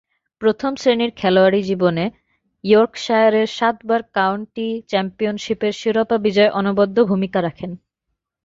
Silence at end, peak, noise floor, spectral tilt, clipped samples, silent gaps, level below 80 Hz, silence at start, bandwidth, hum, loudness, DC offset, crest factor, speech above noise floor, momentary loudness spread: 0.7 s; -2 dBFS; -78 dBFS; -6 dB/octave; under 0.1%; none; -58 dBFS; 0.4 s; 7.8 kHz; none; -18 LUFS; under 0.1%; 16 dB; 60 dB; 10 LU